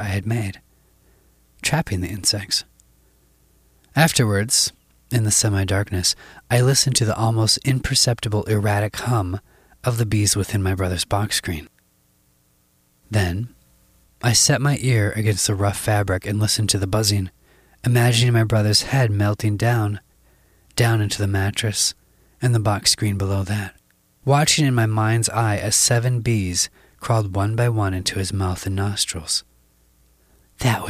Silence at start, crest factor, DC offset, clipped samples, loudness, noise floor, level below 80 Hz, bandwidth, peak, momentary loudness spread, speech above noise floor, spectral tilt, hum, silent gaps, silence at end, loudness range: 0 s; 20 dB; under 0.1%; under 0.1%; -20 LUFS; -61 dBFS; -46 dBFS; 15.5 kHz; 0 dBFS; 9 LU; 42 dB; -4 dB/octave; none; none; 0 s; 5 LU